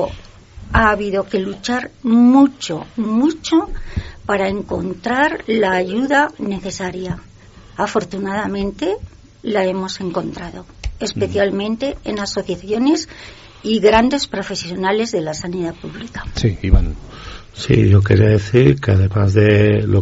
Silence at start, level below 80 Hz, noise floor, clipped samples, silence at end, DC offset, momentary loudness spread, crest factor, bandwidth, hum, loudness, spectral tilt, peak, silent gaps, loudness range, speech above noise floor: 0 s; -30 dBFS; -36 dBFS; under 0.1%; 0 s; under 0.1%; 16 LU; 16 dB; 8 kHz; none; -17 LUFS; -5.5 dB/octave; 0 dBFS; none; 7 LU; 19 dB